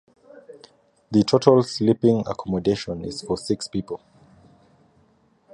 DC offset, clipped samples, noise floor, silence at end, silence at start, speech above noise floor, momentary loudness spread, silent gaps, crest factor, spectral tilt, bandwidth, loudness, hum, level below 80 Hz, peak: under 0.1%; under 0.1%; -61 dBFS; 1.6 s; 0.5 s; 40 dB; 13 LU; none; 24 dB; -6.5 dB/octave; 11 kHz; -22 LUFS; none; -54 dBFS; 0 dBFS